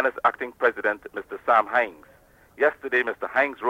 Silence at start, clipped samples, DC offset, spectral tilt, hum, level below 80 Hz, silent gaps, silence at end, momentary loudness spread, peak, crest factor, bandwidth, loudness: 0 s; under 0.1%; under 0.1%; -4.5 dB/octave; none; -64 dBFS; none; 0 s; 10 LU; -8 dBFS; 18 dB; 16 kHz; -24 LUFS